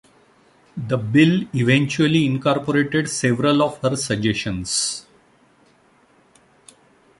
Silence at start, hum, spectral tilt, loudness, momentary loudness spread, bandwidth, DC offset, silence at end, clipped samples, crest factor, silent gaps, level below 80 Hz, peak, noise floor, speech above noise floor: 0.75 s; none; -5 dB/octave; -19 LUFS; 9 LU; 11.5 kHz; under 0.1%; 2.2 s; under 0.1%; 18 dB; none; -52 dBFS; -2 dBFS; -56 dBFS; 37 dB